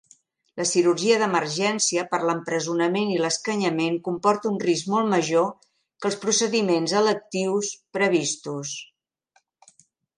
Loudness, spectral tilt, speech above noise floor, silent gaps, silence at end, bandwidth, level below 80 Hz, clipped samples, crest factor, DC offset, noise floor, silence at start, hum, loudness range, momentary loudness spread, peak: -23 LUFS; -3.5 dB/octave; 44 dB; none; 1.35 s; 11 kHz; -74 dBFS; under 0.1%; 18 dB; under 0.1%; -67 dBFS; 0.55 s; none; 2 LU; 8 LU; -6 dBFS